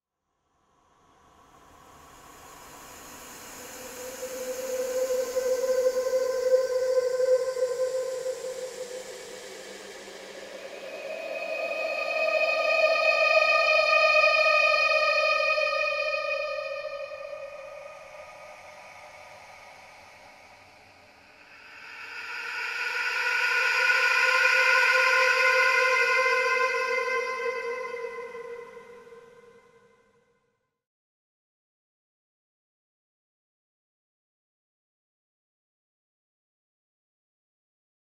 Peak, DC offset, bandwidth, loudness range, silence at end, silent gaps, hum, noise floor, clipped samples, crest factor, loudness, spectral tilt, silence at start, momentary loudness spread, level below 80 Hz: -10 dBFS; under 0.1%; 16 kHz; 21 LU; 8.9 s; none; none; -78 dBFS; under 0.1%; 20 dB; -24 LUFS; 0 dB/octave; 2.15 s; 23 LU; -68 dBFS